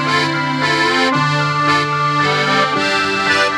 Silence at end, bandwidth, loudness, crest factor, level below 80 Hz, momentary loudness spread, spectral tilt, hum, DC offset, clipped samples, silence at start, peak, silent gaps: 0 s; 13 kHz; -14 LUFS; 14 dB; -56 dBFS; 2 LU; -4 dB/octave; none; under 0.1%; under 0.1%; 0 s; -2 dBFS; none